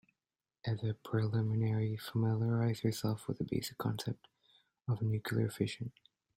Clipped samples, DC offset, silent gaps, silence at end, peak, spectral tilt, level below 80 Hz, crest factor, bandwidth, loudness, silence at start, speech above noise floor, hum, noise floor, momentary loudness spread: under 0.1%; under 0.1%; none; 0.45 s; -20 dBFS; -7 dB/octave; -68 dBFS; 16 dB; 16 kHz; -36 LUFS; 0.65 s; over 55 dB; none; under -90 dBFS; 9 LU